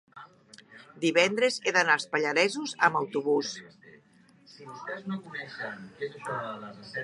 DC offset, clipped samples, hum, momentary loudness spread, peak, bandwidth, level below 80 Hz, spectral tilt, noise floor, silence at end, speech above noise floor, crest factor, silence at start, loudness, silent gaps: under 0.1%; under 0.1%; none; 15 LU; -6 dBFS; 11.5 kHz; -78 dBFS; -3.5 dB/octave; -60 dBFS; 0 s; 31 dB; 24 dB; 0.15 s; -28 LUFS; none